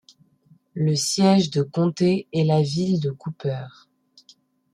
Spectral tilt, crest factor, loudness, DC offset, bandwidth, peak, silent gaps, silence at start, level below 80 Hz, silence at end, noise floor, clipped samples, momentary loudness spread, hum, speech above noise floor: -6 dB/octave; 16 dB; -22 LUFS; under 0.1%; 13 kHz; -6 dBFS; none; 0.75 s; -62 dBFS; 1.05 s; -58 dBFS; under 0.1%; 12 LU; none; 37 dB